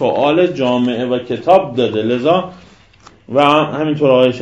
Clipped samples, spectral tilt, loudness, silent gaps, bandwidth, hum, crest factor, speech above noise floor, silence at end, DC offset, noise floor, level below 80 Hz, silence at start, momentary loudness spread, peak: 0.1%; -7 dB/octave; -14 LUFS; none; 8.4 kHz; none; 14 dB; 32 dB; 0 s; 0.1%; -45 dBFS; -54 dBFS; 0 s; 7 LU; 0 dBFS